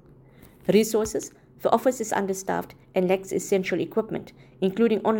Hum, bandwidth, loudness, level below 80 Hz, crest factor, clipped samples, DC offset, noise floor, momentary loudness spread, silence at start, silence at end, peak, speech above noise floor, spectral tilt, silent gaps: none; 17 kHz; -25 LUFS; -58 dBFS; 20 dB; under 0.1%; under 0.1%; -51 dBFS; 10 LU; 0.65 s; 0 s; -4 dBFS; 27 dB; -5 dB/octave; none